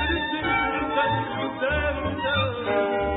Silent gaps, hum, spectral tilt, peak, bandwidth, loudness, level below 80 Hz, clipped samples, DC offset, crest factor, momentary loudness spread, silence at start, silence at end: none; none; -10 dB/octave; -10 dBFS; 4.1 kHz; -24 LUFS; -38 dBFS; under 0.1%; under 0.1%; 14 dB; 3 LU; 0 s; 0 s